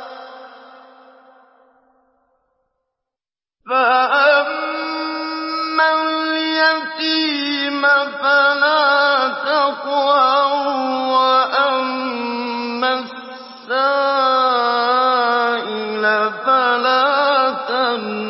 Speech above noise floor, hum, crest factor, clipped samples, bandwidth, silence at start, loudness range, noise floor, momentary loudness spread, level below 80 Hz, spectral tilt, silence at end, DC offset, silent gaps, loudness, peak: over 75 dB; none; 14 dB; under 0.1%; 5.8 kHz; 0 s; 4 LU; under -90 dBFS; 9 LU; -74 dBFS; -6.5 dB/octave; 0 s; under 0.1%; none; -16 LUFS; -2 dBFS